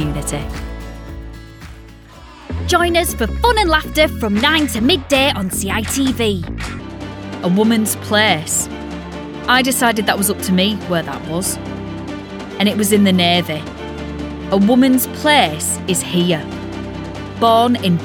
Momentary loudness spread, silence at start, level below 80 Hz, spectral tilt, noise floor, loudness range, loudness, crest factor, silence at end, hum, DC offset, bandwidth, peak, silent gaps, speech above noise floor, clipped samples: 16 LU; 0 s; -32 dBFS; -4 dB/octave; -38 dBFS; 3 LU; -16 LUFS; 16 dB; 0 s; none; under 0.1%; over 20 kHz; 0 dBFS; none; 23 dB; under 0.1%